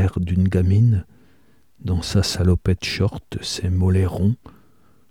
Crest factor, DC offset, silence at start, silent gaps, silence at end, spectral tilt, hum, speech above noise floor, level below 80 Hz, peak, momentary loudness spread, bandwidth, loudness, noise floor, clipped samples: 16 dB; 0.2%; 0 s; none; 0.6 s; -6.5 dB/octave; none; 39 dB; -36 dBFS; -4 dBFS; 9 LU; 13 kHz; -21 LUFS; -58 dBFS; under 0.1%